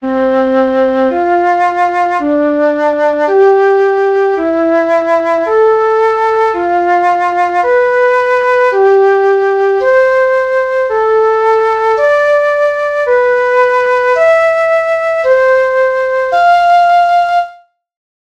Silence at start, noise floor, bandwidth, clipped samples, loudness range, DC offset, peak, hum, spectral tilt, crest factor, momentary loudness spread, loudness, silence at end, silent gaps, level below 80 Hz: 0 s; -38 dBFS; 8.8 kHz; under 0.1%; 1 LU; under 0.1%; 0 dBFS; none; -4.5 dB/octave; 10 dB; 4 LU; -10 LUFS; 0.85 s; none; -50 dBFS